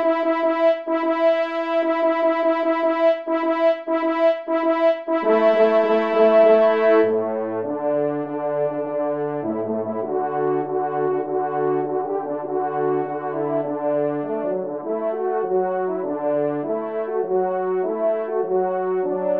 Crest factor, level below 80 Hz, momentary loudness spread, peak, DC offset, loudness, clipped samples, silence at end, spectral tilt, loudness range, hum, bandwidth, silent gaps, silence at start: 16 dB; -76 dBFS; 8 LU; -4 dBFS; 0.2%; -21 LUFS; under 0.1%; 0 s; -8 dB/octave; 6 LU; none; 5.6 kHz; none; 0 s